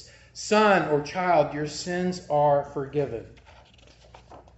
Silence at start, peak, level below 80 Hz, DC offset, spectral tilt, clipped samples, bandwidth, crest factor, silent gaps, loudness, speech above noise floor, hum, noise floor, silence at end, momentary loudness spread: 0 s; -8 dBFS; -56 dBFS; under 0.1%; -5 dB/octave; under 0.1%; 8.2 kHz; 18 dB; none; -24 LUFS; 29 dB; none; -53 dBFS; 0.15 s; 12 LU